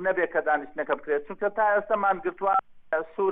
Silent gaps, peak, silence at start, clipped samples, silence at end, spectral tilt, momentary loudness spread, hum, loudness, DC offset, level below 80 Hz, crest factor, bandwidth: none; -10 dBFS; 0 s; under 0.1%; 0 s; -8.5 dB/octave; 6 LU; none; -26 LUFS; under 0.1%; -62 dBFS; 16 dB; 3.8 kHz